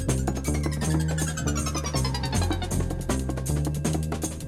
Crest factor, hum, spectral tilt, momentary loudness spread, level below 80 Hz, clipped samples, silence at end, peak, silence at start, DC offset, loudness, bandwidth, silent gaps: 16 dB; none; -5 dB/octave; 3 LU; -32 dBFS; under 0.1%; 0 s; -10 dBFS; 0 s; under 0.1%; -27 LUFS; 16 kHz; none